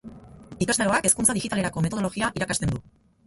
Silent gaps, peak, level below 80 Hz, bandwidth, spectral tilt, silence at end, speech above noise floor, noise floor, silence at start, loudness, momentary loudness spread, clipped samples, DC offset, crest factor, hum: none; -6 dBFS; -48 dBFS; 12 kHz; -3.5 dB/octave; 0.45 s; 20 dB; -44 dBFS; 0.05 s; -24 LUFS; 9 LU; under 0.1%; under 0.1%; 20 dB; none